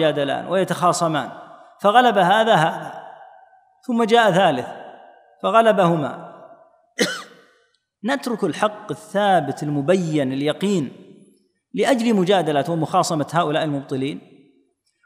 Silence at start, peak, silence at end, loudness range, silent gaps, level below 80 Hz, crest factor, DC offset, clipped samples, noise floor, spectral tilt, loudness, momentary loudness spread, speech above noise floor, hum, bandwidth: 0 s; -2 dBFS; 0.85 s; 4 LU; none; -72 dBFS; 20 dB; under 0.1%; under 0.1%; -64 dBFS; -5 dB/octave; -19 LUFS; 17 LU; 45 dB; none; 15.5 kHz